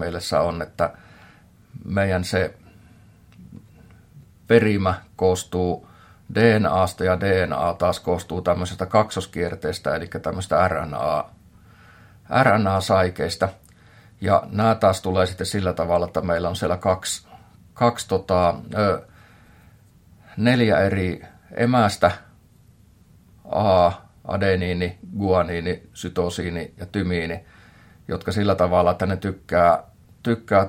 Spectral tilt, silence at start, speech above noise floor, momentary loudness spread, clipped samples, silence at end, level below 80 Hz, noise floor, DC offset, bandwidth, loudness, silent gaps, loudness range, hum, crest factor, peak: -6 dB/octave; 0 s; 32 dB; 11 LU; under 0.1%; 0 s; -52 dBFS; -53 dBFS; under 0.1%; 16.5 kHz; -22 LUFS; none; 5 LU; none; 20 dB; -2 dBFS